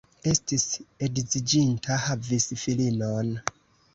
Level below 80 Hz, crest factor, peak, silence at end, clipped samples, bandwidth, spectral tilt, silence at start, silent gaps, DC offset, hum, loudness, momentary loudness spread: -54 dBFS; 22 dB; -6 dBFS; 0.45 s; under 0.1%; 8.2 kHz; -4 dB/octave; 0.25 s; none; under 0.1%; none; -26 LUFS; 7 LU